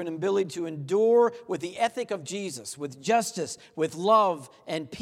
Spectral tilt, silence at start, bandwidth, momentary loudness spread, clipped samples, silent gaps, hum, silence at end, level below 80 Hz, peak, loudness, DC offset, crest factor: -4.5 dB/octave; 0 s; 15 kHz; 13 LU; under 0.1%; none; none; 0 s; -74 dBFS; -10 dBFS; -27 LUFS; under 0.1%; 16 dB